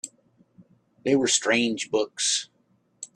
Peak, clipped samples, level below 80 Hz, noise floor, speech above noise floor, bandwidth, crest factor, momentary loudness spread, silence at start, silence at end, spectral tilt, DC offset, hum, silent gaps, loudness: -8 dBFS; under 0.1%; -72 dBFS; -67 dBFS; 43 dB; 12.5 kHz; 20 dB; 20 LU; 0.05 s; 0.1 s; -2 dB/octave; under 0.1%; none; none; -24 LUFS